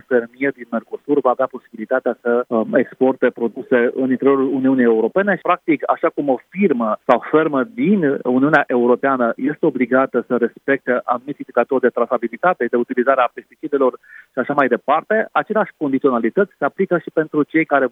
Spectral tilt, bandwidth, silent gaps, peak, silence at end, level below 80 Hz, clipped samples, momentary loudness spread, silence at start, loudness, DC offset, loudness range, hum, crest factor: -9 dB/octave; 3.9 kHz; none; 0 dBFS; 0.05 s; -72 dBFS; under 0.1%; 6 LU; 0.1 s; -18 LUFS; under 0.1%; 2 LU; none; 18 dB